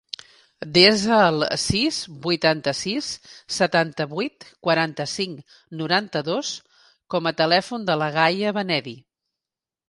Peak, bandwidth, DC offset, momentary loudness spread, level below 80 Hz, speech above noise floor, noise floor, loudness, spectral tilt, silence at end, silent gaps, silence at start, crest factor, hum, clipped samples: 0 dBFS; 11.5 kHz; under 0.1%; 14 LU; -54 dBFS; 67 dB; -89 dBFS; -21 LUFS; -4 dB/octave; 0.9 s; none; 0.6 s; 22 dB; none; under 0.1%